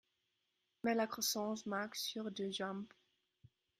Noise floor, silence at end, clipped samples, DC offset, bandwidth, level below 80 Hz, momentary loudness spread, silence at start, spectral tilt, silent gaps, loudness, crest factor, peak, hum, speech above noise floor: -85 dBFS; 0.9 s; under 0.1%; under 0.1%; 16 kHz; -84 dBFS; 7 LU; 0.85 s; -3 dB/octave; none; -40 LUFS; 18 dB; -24 dBFS; none; 45 dB